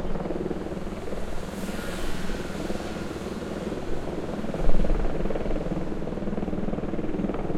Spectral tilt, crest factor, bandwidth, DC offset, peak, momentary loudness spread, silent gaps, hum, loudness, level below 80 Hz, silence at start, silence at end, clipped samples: -6.5 dB/octave; 18 dB; 12 kHz; under 0.1%; -6 dBFS; 5 LU; none; none; -31 LUFS; -32 dBFS; 0 s; 0 s; under 0.1%